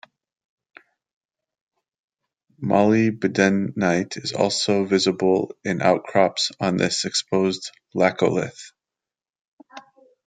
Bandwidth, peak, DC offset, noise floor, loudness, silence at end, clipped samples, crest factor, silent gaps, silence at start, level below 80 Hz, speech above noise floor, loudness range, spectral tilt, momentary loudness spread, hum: 9.4 kHz; -4 dBFS; under 0.1%; under -90 dBFS; -21 LUFS; 0.45 s; under 0.1%; 20 dB; 9.41-9.58 s; 2.6 s; -66 dBFS; over 69 dB; 4 LU; -4.5 dB/octave; 8 LU; none